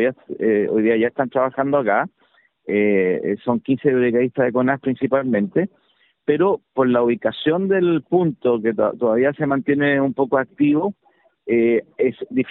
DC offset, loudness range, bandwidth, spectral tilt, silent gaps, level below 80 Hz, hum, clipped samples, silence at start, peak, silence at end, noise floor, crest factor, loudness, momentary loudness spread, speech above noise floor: under 0.1%; 1 LU; 4.1 kHz; -11 dB/octave; none; -62 dBFS; none; under 0.1%; 0 s; -4 dBFS; 0 s; -60 dBFS; 16 dB; -19 LUFS; 5 LU; 41 dB